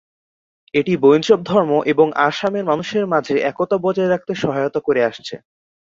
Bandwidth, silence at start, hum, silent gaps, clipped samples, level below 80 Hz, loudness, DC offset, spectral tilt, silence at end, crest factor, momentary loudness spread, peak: 7.6 kHz; 0.75 s; none; none; under 0.1%; -60 dBFS; -17 LUFS; under 0.1%; -6 dB/octave; 0.55 s; 16 dB; 7 LU; -2 dBFS